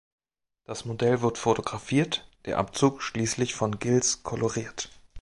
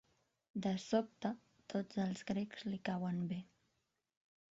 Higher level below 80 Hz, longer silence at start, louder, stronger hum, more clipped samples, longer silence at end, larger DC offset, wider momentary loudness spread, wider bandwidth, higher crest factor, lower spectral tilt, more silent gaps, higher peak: first, -56 dBFS vs -76 dBFS; first, 0.7 s vs 0.55 s; first, -27 LUFS vs -41 LUFS; neither; neither; second, 0 s vs 1.1 s; neither; first, 11 LU vs 7 LU; first, 11.5 kHz vs 7.6 kHz; about the same, 20 dB vs 20 dB; second, -4.5 dB/octave vs -6 dB/octave; neither; first, -8 dBFS vs -22 dBFS